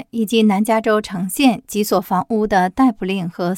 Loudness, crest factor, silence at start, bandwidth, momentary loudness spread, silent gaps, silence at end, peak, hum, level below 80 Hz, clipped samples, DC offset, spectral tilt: -17 LUFS; 16 dB; 0 s; 17 kHz; 7 LU; none; 0 s; -2 dBFS; none; -48 dBFS; under 0.1%; under 0.1%; -5.5 dB/octave